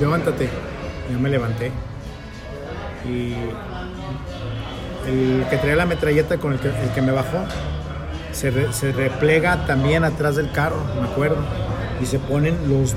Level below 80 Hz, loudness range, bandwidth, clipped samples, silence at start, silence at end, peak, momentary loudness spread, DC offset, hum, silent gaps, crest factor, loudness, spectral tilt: -34 dBFS; 7 LU; 16 kHz; under 0.1%; 0 s; 0 s; -4 dBFS; 12 LU; under 0.1%; none; none; 16 dB; -22 LUFS; -6.5 dB/octave